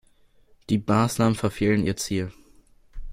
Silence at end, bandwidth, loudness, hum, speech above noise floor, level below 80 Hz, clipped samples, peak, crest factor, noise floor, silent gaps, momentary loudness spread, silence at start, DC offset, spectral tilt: 0 s; 16 kHz; -24 LUFS; none; 35 dB; -44 dBFS; under 0.1%; -6 dBFS; 20 dB; -58 dBFS; none; 7 LU; 0.7 s; under 0.1%; -6 dB/octave